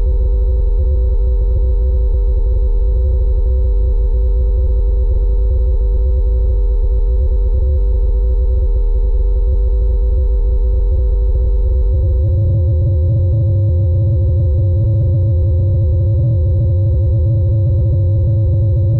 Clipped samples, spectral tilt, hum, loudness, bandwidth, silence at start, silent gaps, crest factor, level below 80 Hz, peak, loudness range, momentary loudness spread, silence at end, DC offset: under 0.1%; -13 dB/octave; none; -15 LUFS; 1.3 kHz; 0 s; none; 4 dB; -14 dBFS; -8 dBFS; 2 LU; 3 LU; 0 s; under 0.1%